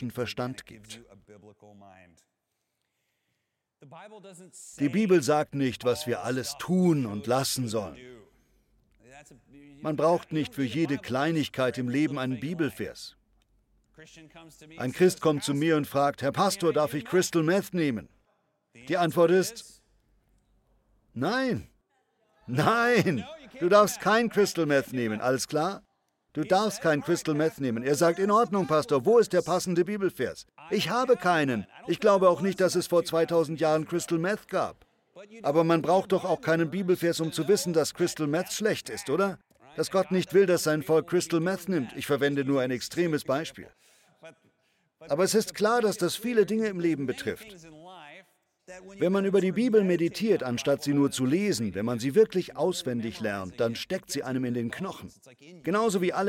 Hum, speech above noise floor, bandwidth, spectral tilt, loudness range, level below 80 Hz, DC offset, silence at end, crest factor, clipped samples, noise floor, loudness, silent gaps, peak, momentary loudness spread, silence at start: none; 54 dB; 17 kHz; -5 dB/octave; 6 LU; -66 dBFS; under 0.1%; 0 s; 20 dB; under 0.1%; -81 dBFS; -27 LUFS; none; -8 dBFS; 11 LU; 0 s